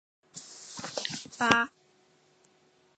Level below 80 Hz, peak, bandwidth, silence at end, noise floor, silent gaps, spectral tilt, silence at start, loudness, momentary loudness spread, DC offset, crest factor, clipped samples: -68 dBFS; -4 dBFS; 9 kHz; 1.3 s; -66 dBFS; none; -2.5 dB/octave; 0.35 s; -29 LUFS; 21 LU; under 0.1%; 30 dB; under 0.1%